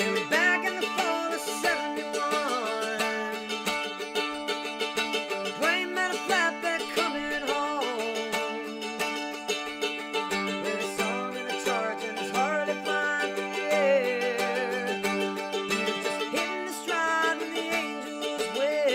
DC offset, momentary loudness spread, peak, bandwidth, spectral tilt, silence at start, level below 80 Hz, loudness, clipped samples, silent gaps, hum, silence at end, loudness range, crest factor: under 0.1%; 6 LU; -12 dBFS; 16.5 kHz; -2.5 dB/octave; 0 s; -68 dBFS; -28 LUFS; under 0.1%; none; none; 0 s; 3 LU; 18 dB